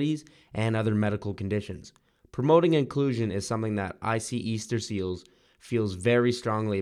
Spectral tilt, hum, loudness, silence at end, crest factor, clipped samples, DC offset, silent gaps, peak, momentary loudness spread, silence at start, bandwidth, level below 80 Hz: -6.5 dB/octave; none; -27 LUFS; 0 s; 20 dB; under 0.1%; under 0.1%; none; -8 dBFS; 12 LU; 0 s; 12.5 kHz; -62 dBFS